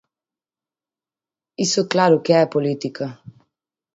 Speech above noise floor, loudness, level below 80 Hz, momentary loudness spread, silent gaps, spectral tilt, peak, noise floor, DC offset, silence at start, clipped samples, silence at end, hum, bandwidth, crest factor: over 71 dB; -18 LUFS; -66 dBFS; 15 LU; none; -4.5 dB/octave; -2 dBFS; under -90 dBFS; under 0.1%; 1.6 s; under 0.1%; 0.65 s; none; 8 kHz; 20 dB